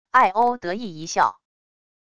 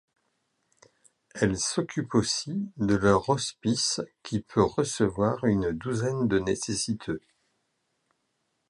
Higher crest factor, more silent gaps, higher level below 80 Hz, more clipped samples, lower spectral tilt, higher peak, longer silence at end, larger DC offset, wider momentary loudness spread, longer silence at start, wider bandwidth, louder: about the same, 20 dB vs 20 dB; neither; second, -62 dBFS vs -52 dBFS; neither; about the same, -3.5 dB/octave vs -4.5 dB/octave; first, -4 dBFS vs -8 dBFS; second, 0.8 s vs 1.5 s; neither; first, 12 LU vs 9 LU; second, 0.15 s vs 1.35 s; about the same, 11 kHz vs 11.5 kHz; first, -22 LUFS vs -27 LUFS